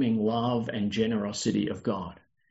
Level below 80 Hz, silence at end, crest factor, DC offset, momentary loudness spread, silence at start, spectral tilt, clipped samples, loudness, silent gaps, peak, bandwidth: -62 dBFS; 0.35 s; 14 dB; under 0.1%; 6 LU; 0 s; -5.5 dB/octave; under 0.1%; -29 LUFS; none; -14 dBFS; 8 kHz